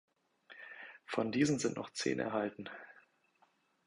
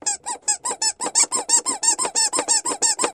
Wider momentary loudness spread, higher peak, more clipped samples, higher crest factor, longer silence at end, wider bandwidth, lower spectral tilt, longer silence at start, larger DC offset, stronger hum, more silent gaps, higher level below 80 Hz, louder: first, 20 LU vs 6 LU; second, -16 dBFS vs -4 dBFS; neither; about the same, 22 dB vs 18 dB; first, 0.9 s vs 0 s; second, 11 kHz vs 15.5 kHz; first, -4.5 dB/octave vs 1.5 dB/octave; first, 0.5 s vs 0.05 s; neither; neither; neither; second, -74 dBFS vs -66 dBFS; second, -36 LUFS vs -19 LUFS